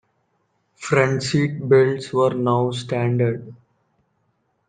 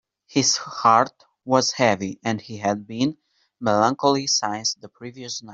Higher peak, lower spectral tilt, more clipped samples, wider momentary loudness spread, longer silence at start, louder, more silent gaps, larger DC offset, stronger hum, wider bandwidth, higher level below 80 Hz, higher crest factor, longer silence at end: about the same, -2 dBFS vs -2 dBFS; first, -6.5 dB/octave vs -3.5 dB/octave; neither; second, 7 LU vs 14 LU; first, 0.8 s vs 0.3 s; about the same, -20 LUFS vs -21 LUFS; neither; neither; neither; first, 9.4 kHz vs 8 kHz; first, -60 dBFS vs -66 dBFS; about the same, 20 dB vs 20 dB; first, 1.15 s vs 0 s